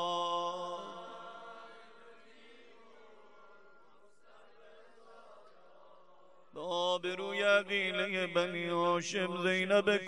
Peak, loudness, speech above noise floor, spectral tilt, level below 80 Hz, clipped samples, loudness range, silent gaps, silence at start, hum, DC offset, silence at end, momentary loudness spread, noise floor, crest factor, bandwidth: -14 dBFS; -33 LUFS; 33 dB; -4 dB/octave; -84 dBFS; under 0.1%; 22 LU; none; 0 s; none; 0.1%; 0 s; 20 LU; -65 dBFS; 22 dB; 11 kHz